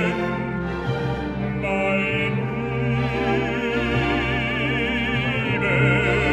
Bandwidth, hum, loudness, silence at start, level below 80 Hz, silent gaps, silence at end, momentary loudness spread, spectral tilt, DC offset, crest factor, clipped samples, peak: 8.6 kHz; none; -22 LUFS; 0 s; -36 dBFS; none; 0 s; 7 LU; -7 dB/octave; under 0.1%; 16 dB; under 0.1%; -6 dBFS